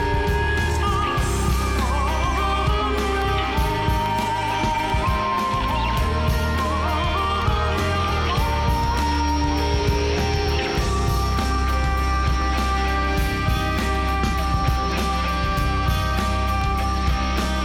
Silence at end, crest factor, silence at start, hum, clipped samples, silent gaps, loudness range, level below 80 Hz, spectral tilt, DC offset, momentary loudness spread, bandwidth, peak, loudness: 0 s; 10 dB; 0 s; none; under 0.1%; none; 1 LU; -24 dBFS; -5.5 dB/octave; under 0.1%; 1 LU; 16 kHz; -10 dBFS; -22 LUFS